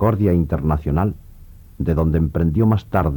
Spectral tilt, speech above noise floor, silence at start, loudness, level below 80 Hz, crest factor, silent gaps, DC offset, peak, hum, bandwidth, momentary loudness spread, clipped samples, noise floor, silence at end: -10.5 dB/octave; 24 dB; 0 s; -19 LUFS; -28 dBFS; 14 dB; none; under 0.1%; -4 dBFS; none; 19 kHz; 6 LU; under 0.1%; -41 dBFS; 0 s